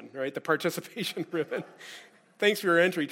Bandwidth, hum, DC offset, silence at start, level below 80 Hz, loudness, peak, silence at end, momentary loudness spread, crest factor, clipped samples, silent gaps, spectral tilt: 16.5 kHz; none; under 0.1%; 0 s; -80 dBFS; -28 LUFS; -10 dBFS; 0 s; 20 LU; 20 dB; under 0.1%; none; -4.5 dB/octave